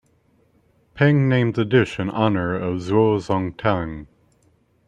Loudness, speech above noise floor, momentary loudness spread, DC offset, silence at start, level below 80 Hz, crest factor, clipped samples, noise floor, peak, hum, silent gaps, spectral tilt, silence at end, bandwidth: -20 LUFS; 41 dB; 7 LU; under 0.1%; 0.95 s; -52 dBFS; 18 dB; under 0.1%; -61 dBFS; -2 dBFS; none; none; -8 dB/octave; 0.85 s; 9 kHz